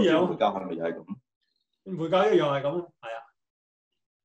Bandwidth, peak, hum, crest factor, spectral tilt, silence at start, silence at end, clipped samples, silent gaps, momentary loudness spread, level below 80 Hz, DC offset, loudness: 8.2 kHz; -10 dBFS; none; 18 dB; -6.5 dB/octave; 0 s; 1 s; under 0.1%; 1.36-1.41 s; 18 LU; -72 dBFS; under 0.1%; -26 LUFS